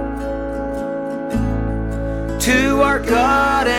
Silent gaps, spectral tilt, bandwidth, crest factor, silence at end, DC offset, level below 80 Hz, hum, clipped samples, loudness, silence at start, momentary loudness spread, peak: none; -5 dB/octave; 17 kHz; 14 dB; 0 s; under 0.1%; -28 dBFS; none; under 0.1%; -18 LUFS; 0 s; 10 LU; -4 dBFS